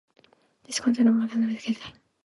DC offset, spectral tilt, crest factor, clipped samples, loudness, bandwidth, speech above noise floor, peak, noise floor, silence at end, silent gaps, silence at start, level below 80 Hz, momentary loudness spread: under 0.1%; -4.5 dB/octave; 16 dB; under 0.1%; -25 LUFS; 11.5 kHz; 36 dB; -10 dBFS; -61 dBFS; 0.35 s; none; 0.7 s; -68 dBFS; 12 LU